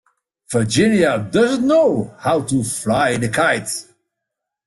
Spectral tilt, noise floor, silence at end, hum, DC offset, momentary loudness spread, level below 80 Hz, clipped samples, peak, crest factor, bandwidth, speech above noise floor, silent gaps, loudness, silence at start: -5 dB/octave; -81 dBFS; 0.85 s; none; under 0.1%; 7 LU; -52 dBFS; under 0.1%; -4 dBFS; 14 dB; 12.5 kHz; 64 dB; none; -17 LUFS; 0.5 s